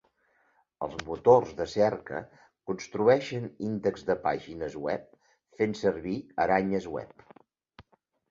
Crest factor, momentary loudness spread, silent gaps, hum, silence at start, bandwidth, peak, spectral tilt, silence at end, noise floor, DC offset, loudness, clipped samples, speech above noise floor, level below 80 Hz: 22 dB; 15 LU; none; none; 0.8 s; 7.6 kHz; -8 dBFS; -6.5 dB/octave; 0.5 s; -69 dBFS; under 0.1%; -29 LUFS; under 0.1%; 41 dB; -60 dBFS